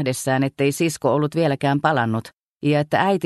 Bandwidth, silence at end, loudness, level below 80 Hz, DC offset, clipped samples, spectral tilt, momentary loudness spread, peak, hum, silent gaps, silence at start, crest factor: 12.5 kHz; 0 s; -21 LUFS; -60 dBFS; under 0.1%; under 0.1%; -5.5 dB/octave; 3 LU; -4 dBFS; none; 2.38-2.57 s; 0 s; 16 dB